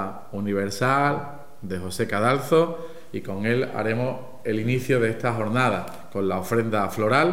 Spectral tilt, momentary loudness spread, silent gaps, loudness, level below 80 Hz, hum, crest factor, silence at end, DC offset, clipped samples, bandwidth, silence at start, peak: -6 dB/octave; 12 LU; none; -24 LUFS; -62 dBFS; none; 18 dB; 0 s; 1%; under 0.1%; 16 kHz; 0 s; -6 dBFS